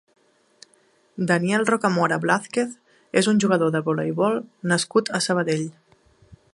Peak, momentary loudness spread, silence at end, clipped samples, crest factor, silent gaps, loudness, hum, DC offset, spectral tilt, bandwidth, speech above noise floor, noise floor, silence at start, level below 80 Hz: -2 dBFS; 8 LU; 0.2 s; under 0.1%; 20 dB; none; -22 LUFS; none; under 0.1%; -5 dB/octave; 11.5 kHz; 39 dB; -61 dBFS; 1.15 s; -66 dBFS